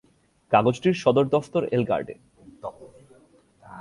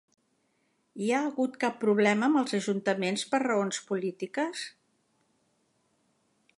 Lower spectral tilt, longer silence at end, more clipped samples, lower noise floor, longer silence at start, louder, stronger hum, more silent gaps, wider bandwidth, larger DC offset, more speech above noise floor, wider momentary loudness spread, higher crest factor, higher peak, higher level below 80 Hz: first, -7 dB/octave vs -4.5 dB/octave; second, 0 s vs 1.9 s; neither; second, -57 dBFS vs -73 dBFS; second, 0.5 s vs 0.95 s; first, -23 LUFS vs -29 LUFS; neither; neither; about the same, 11.5 kHz vs 11.5 kHz; neither; second, 34 dB vs 45 dB; first, 19 LU vs 9 LU; about the same, 20 dB vs 20 dB; first, -4 dBFS vs -10 dBFS; first, -60 dBFS vs -82 dBFS